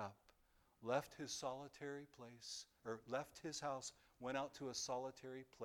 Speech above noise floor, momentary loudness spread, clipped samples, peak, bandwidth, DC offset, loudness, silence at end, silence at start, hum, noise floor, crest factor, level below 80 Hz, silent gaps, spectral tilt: 28 dB; 10 LU; under 0.1%; -26 dBFS; 19 kHz; under 0.1%; -49 LUFS; 0 s; 0 s; none; -77 dBFS; 22 dB; -80 dBFS; none; -3 dB/octave